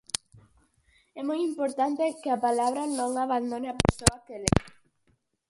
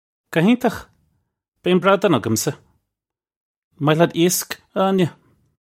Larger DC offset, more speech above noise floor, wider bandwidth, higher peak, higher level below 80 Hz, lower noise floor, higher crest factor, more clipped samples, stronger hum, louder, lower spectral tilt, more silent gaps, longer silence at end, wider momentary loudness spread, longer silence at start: neither; second, 44 dB vs 68 dB; about the same, 16 kHz vs 16.5 kHz; about the same, 0 dBFS vs 0 dBFS; first, -44 dBFS vs -58 dBFS; second, -71 dBFS vs -86 dBFS; first, 28 dB vs 20 dB; neither; neither; second, -28 LUFS vs -19 LUFS; about the same, -4.5 dB/octave vs -5 dB/octave; second, none vs 1.48-1.52 s, 3.36-3.71 s; first, 0.8 s vs 0.5 s; about the same, 8 LU vs 10 LU; about the same, 0.35 s vs 0.3 s